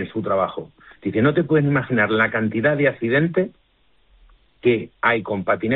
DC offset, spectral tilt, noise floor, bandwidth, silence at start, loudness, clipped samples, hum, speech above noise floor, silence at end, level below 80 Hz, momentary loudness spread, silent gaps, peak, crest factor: under 0.1%; -5.5 dB/octave; -60 dBFS; 4.1 kHz; 0 s; -20 LUFS; under 0.1%; none; 40 dB; 0 s; -56 dBFS; 7 LU; none; -4 dBFS; 16 dB